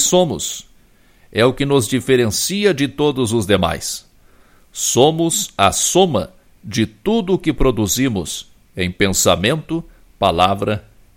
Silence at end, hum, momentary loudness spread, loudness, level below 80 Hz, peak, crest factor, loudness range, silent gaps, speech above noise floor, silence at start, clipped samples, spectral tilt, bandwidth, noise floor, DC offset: 0.35 s; none; 12 LU; -17 LUFS; -36 dBFS; 0 dBFS; 18 dB; 2 LU; none; 34 dB; 0 s; under 0.1%; -4 dB/octave; 16.5 kHz; -50 dBFS; under 0.1%